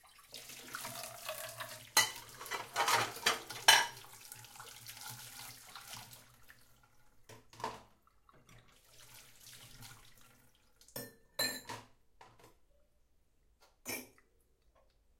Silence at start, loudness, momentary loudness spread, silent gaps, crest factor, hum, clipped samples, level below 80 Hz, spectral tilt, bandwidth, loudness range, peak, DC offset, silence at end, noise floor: 0.2 s; -35 LUFS; 24 LU; none; 34 dB; none; under 0.1%; -72 dBFS; 0 dB/octave; 16.5 kHz; 21 LU; -8 dBFS; under 0.1%; 1.1 s; -71 dBFS